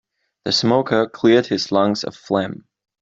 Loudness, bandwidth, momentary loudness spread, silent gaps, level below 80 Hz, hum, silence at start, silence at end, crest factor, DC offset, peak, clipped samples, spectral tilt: -18 LUFS; 7.8 kHz; 12 LU; none; -60 dBFS; none; 0.45 s; 0.45 s; 18 dB; under 0.1%; -2 dBFS; under 0.1%; -5 dB/octave